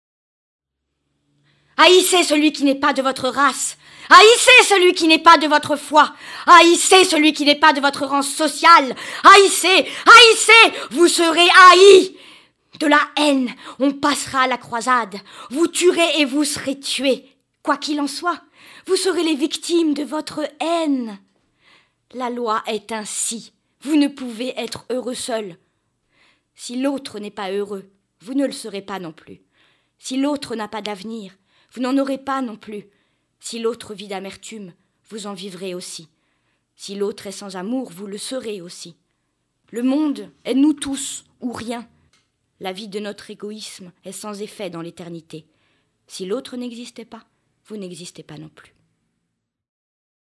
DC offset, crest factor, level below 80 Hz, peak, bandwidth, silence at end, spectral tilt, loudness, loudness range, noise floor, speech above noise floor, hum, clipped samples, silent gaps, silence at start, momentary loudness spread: under 0.1%; 18 dB; -66 dBFS; 0 dBFS; 12 kHz; 1.8 s; -1.5 dB/octave; -14 LUFS; 21 LU; -77 dBFS; 60 dB; none; 0.2%; none; 1.8 s; 24 LU